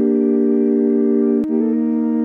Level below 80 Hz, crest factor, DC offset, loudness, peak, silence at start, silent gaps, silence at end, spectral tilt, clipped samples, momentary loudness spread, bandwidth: -62 dBFS; 10 dB; under 0.1%; -16 LUFS; -6 dBFS; 0 s; none; 0 s; -11 dB/octave; under 0.1%; 2 LU; 2.5 kHz